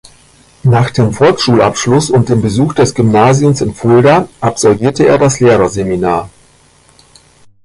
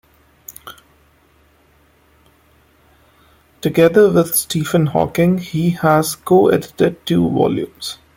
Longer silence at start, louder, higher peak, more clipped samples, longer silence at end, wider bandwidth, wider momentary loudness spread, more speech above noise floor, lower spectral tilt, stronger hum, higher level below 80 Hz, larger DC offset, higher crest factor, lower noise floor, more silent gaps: first, 0.65 s vs 0.5 s; first, -10 LUFS vs -15 LUFS; about the same, 0 dBFS vs -2 dBFS; neither; first, 1.35 s vs 0.2 s; second, 11.5 kHz vs 17 kHz; second, 6 LU vs 14 LU; about the same, 37 dB vs 39 dB; about the same, -6 dB/octave vs -5.5 dB/octave; first, 60 Hz at -35 dBFS vs none; first, -38 dBFS vs -50 dBFS; neither; second, 10 dB vs 16 dB; second, -46 dBFS vs -54 dBFS; neither